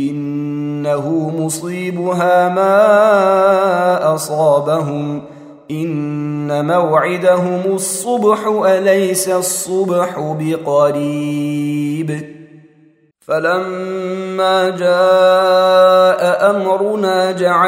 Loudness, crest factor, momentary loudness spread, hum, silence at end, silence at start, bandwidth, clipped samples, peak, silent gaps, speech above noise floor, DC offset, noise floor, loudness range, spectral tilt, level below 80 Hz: -14 LUFS; 14 dB; 11 LU; none; 0 s; 0 s; 16 kHz; under 0.1%; 0 dBFS; none; 37 dB; under 0.1%; -51 dBFS; 6 LU; -5 dB/octave; -66 dBFS